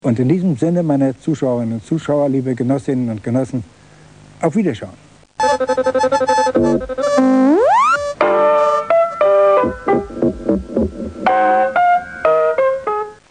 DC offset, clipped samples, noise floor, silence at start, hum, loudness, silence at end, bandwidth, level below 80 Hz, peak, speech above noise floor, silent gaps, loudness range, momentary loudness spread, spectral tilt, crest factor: 0.1%; under 0.1%; -43 dBFS; 0.05 s; none; -16 LUFS; 0.15 s; 10 kHz; -42 dBFS; 0 dBFS; 28 dB; none; 6 LU; 8 LU; -7 dB/octave; 16 dB